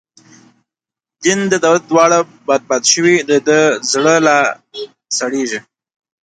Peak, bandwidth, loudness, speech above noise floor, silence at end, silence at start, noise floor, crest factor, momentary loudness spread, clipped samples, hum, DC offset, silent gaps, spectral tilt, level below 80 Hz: 0 dBFS; 10.5 kHz; -13 LUFS; 74 dB; 0.7 s; 1.2 s; -87 dBFS; 14 dB; 10 LU; under 0.1%; none; under 0.1%; none; -3 dB/octave; -62 dBFS